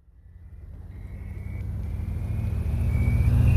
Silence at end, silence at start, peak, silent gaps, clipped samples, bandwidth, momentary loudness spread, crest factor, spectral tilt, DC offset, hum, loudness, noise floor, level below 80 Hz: 0 s; 0.4 s; -10 dBFS; none; under 0.1%; 13.5 kHz; 21 LU; 16 dB; -8.5 dB/octave; under 0.1%; none; -28 LUFS; -48 dBFS; -30 dBFS